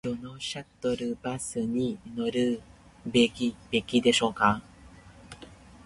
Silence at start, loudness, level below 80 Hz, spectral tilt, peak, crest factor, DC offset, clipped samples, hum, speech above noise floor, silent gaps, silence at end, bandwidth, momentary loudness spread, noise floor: 0.05 s; -28 LUFS; -56 dBFS; -4 dB/octave; -8 dBFS; 22 dB; under 0.1%; under 0.1%; none; 24 dB; none; 0.1 s; 11.5 kHz; 14 LU; -51 dBFS